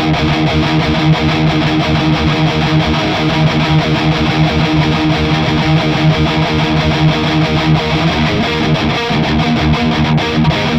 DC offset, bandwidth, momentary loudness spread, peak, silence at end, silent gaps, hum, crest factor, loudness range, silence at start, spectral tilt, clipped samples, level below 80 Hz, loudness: under 0.1%; 8.2 kHz; 1 LU; -2 dBFS; 0 s; none; none; 10 dB; 1 LU; 0 s; -6.5 dB/octave; under 0.1%; -26 dBFS; -12 LUFS